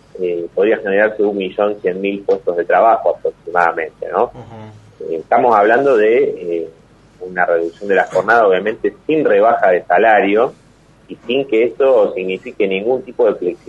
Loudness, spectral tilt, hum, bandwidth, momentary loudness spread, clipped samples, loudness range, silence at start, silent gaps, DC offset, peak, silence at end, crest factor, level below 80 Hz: -15 LUFS; -6.5 dB/octave; none; 8 kHz; 11 LU; under 0.1%; 3 LU; 0.15 s; none; under 0.1%; 0 dBFS; 0.1 s; 16 dB; -56 dBFS